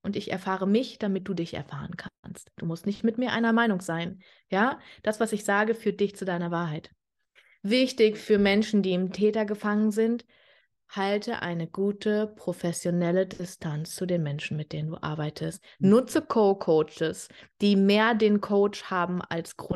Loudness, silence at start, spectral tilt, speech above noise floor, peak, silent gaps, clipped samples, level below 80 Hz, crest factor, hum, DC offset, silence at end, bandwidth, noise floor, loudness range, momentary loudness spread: -27 LUFS; 0.05 s; -6 dB/octave; 37 dB; -10 dBFS; 2.19-2.23 s; under 0.1%; -64 dBFS; 18 dB; none; under 0.1%; 0 s; 12.5 kHz; -64 dBFS; 5 LU; 13 LU